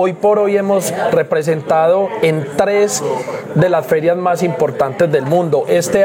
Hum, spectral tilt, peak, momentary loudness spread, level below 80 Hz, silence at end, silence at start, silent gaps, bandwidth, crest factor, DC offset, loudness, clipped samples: none; -5.5 dB/octave; 0 dBFS; 3 LU; -54 dBFS; 0 s; 0 s; none; 17 kHz; 12 dB; under 0.1%; -15 LUFS; under 0.1%